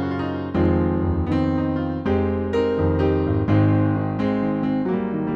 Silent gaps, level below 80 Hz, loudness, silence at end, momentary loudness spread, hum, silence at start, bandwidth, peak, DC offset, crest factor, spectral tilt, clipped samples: none; -38 dBFS; -21 LUFS; 0 s; 5 LU; none; 0 s; 6.4 kHz; -8 dBFS; under 0.1%; 14 dB; -10 dB/octave; under 0.1%